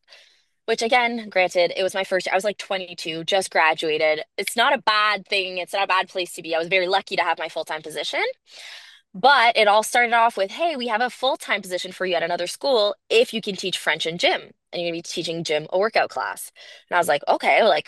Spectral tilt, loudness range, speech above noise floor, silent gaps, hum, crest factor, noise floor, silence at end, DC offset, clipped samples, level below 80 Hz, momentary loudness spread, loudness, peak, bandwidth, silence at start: -2.5 dB/octave; 4 LU; 35 dB; none; none; 18 dB; -57 dBFS; 0.05 s; under 0.1%; under 0.1%; -76 dBFS; 11 LU; -21 LUFS; -4 dBFS; 12.5 kHz; 0.7 s